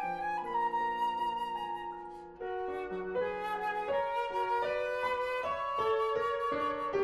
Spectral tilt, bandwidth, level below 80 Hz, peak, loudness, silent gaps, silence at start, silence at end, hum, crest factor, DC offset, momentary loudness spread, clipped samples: -5 dB/octave; 13 kHz; -64 dBFS; -20 dBFS; -34 LUFS; none; 0 s; 0 s; none; 14 dB; under 0.1%; 7 LU; under 0.1%